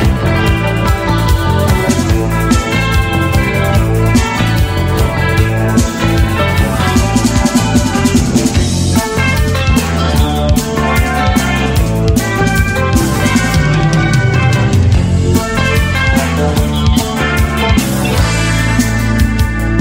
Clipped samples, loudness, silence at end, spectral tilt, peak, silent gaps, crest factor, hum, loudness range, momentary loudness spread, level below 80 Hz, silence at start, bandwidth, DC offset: under 0.1%; -12 LUFS; 0 s; -5.5 dB/octave; 0 dBFS; none; 10 dB; none; 1 LU; 2 LU; -18 dBFS; 0 s; 16.5 kHz; under 0.1%